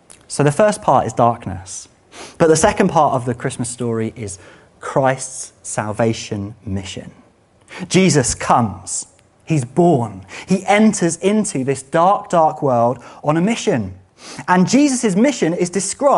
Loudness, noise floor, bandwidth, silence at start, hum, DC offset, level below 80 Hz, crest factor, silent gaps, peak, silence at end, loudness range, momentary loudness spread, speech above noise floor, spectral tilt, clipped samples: -17 LUFS; -51 dBFS; 11.5 kHz; 0.3 s; none; under 0.1%; -48 dBFS; 16 dB; none; 0 dBFS; 0 s; 6 LU; 16 LU; 35 dB; -5 dB/octave; under 0.1%